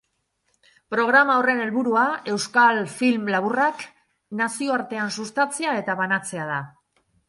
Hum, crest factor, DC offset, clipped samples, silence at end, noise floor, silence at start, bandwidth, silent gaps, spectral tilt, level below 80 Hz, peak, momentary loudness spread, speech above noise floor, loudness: none; 20 dB; under 0.1%; under 0.1%; 0.6 s; -72 dBFS; 0.9 s; 11.5 kHz; none; -4 dB/octave; -72 dBFS; -4 dBFS; 11 LU; 50 dB; -22 LUFS